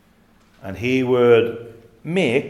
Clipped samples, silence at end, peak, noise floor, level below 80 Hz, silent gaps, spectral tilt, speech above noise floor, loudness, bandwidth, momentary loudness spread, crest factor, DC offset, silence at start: under 0.1%; 0 s; -4 dBFS; -55 dBFS; -58 dBFS; none; -6.5 dB/octave; 37 dB; -18 LUFS; 11.5 kHz; 22 LU; 16 dB; under 0.1%; 0.65 s